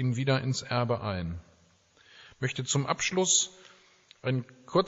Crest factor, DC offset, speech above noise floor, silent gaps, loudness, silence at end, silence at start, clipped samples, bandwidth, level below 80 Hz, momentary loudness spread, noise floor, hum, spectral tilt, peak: 20 dB; under 0.1%; 34 dB; none; -29 LUFS; 0 s; 0 s; under 0.1%; 8 kHz; -58 dBFS; 12 LU; -63 dBFS; none; -4.5 dB/octave; -10 dBFS